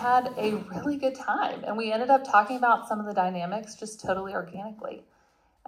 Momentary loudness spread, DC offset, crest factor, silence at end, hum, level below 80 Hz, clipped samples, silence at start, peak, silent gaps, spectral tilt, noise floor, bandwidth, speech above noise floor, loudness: 16 LU; under 0.1%; 22 dB; 0.65 s; none; -66 dBFS; under 0.1%; 0 s; -6 dBFS; none; -5 dB/octave; -65 dBFS; 15.5 kHz; 38 dB; -27 LUFS